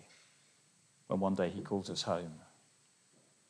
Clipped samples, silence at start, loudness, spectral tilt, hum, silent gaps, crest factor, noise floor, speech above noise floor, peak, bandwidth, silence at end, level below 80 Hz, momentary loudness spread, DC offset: under 0.1%; 0 s; -37 LUFS; -5.5 dB/octave; none; none; 20 dB; -69 dBFS; 33 dB; -20 dBFS; 10.5 kHz; 1.05 s; -76 dBFS; 11 LU; under 0.1%